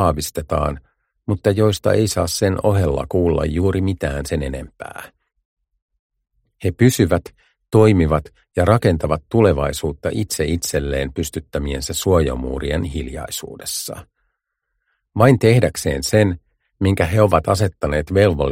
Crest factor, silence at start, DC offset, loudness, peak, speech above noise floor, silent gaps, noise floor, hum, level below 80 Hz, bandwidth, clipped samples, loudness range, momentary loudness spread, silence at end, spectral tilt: 18 dB; 0 s; under 0.1%; -18 LUFS; -2 dBFS; 58 dB; 5.45-5.57 s, 5.82-5.89 s, 5.99-6.10 s; -75 dBFS; none; -34 dBFS; 16.5 kHz; under 0.1%; 6 LU; 12 LU; 0 s; -6 dB/octave